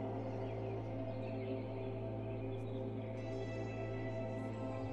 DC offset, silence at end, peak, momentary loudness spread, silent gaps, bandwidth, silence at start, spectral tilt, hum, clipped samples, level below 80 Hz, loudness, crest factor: under 0.1%; 0 s; -30 dBFS; 1 LU; none; 7.8 kHz; 0 s; -8.5 dB/octave; none; under 0.1%; -60 dBFS; -43 LUFS; 12 dB